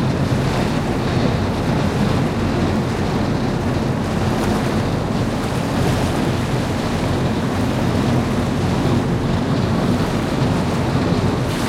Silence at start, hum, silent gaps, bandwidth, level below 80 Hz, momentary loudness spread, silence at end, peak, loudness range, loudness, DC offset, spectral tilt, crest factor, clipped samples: 0 s; none; none; 16 kHz; -32 dBFS; 2 LU; 0 s; -6 dBFS; 1 LU; -19 LUFS; under 0.1%; -6.5 dB/octave; 12 dB; under 0.1%